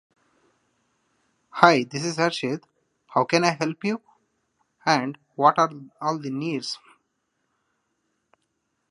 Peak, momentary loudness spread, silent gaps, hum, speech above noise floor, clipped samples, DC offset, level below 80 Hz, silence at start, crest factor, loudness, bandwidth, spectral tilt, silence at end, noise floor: 0 dBFS; 15 LU; none; none; 53 dB; under 0.1%; under 0.1%; -74 dBFS; 1.55 s; 26 dB; -23 LUFS; 11.5 kHz; -4.5 dB/octave; 2.15 s; -75 dBFS